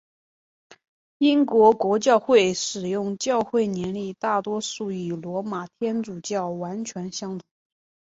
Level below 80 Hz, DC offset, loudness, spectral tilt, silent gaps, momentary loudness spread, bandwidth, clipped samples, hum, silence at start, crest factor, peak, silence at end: -66 dBFS; under 0.1%; -23 LUFS; -4.5 dB/octave; none; 14 LU; 8 kHz; under 0.1%; none; 1.2 s; 18 dB; -4 dBFS; 0.7 s